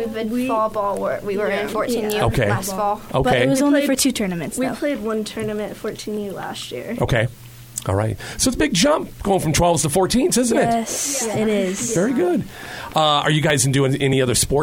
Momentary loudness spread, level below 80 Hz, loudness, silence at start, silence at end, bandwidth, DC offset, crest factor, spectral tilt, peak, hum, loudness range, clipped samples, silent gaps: 10 LU; -40 dBFS; -20 LUFS; 0 s; 0 s; 17 kHz; under 0.1%; 16 dB; -4.5 dB/octave; -4 dBFS; none; 6 LU; under 0.1%; none